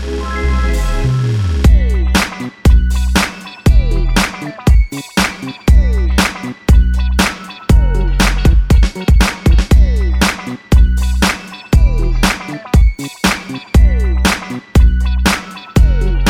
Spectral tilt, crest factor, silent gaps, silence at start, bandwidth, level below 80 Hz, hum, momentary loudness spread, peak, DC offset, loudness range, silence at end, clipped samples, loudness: -5 dB/octave; 12 dB; none; 0 s; 15.5 kHz; -12 dBFS; none; 6 LU; 0 dBFS; under 0.1%; 2 LU; 0 s; under 0.1%; -14 LUFS